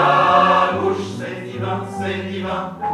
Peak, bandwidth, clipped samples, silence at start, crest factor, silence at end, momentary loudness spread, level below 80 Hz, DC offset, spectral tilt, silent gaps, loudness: -2 dBFS; 12.5 kHz; under 0.1%; 0 s; 18 dB; 0 s; 14 LU; -54 dBFS; under 0.1%; -6 dB/octave; none; -19 LUFS